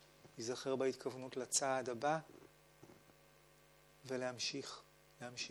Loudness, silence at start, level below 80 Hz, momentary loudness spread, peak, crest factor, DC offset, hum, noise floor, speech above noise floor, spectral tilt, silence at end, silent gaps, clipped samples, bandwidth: -41 LUFS; 0 s; -80 dBFS; 23 LU; -20 dBFS; 22 dB; under 0.1%; none; -67 dBFS; 26 dB; -2.5 dB/octave; 0 s; none; under 0.1%; over 20 kHz